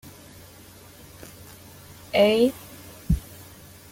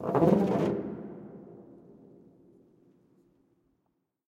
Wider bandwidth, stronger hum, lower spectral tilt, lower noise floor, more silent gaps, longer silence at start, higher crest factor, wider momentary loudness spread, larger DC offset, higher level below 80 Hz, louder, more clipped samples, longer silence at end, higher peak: first, 17 kHz vs 13 kHz; neither; second, -5.5 dB/octave vs -9 dB/octave; second, -48 dBFS vs -78 dBFS; neither; about the same, 0.05 s vs 0 s; about the same, 20 dB vs 22 dB; about the same, 26 LU vs 26 LU; neither; first, -40 dBFS vs -64 dBFS; first, -23 LUFS vs -28 LUFS; neither; second, 0.7 s vs 2.65 s; about the same, -8 dBFS vs -10 dBFS